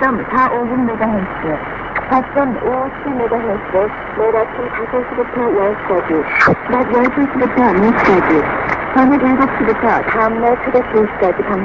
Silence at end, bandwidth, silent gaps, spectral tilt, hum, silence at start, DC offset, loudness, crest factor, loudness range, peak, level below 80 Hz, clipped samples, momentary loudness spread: 0 s; 7.4 kHz; none; -8 dB/octave; none; 0 s; 0.1%; -15 LUFS; 14 dB; 5 LU; 0 dBFS; -40 dBFS; under 0.1%; 8 LU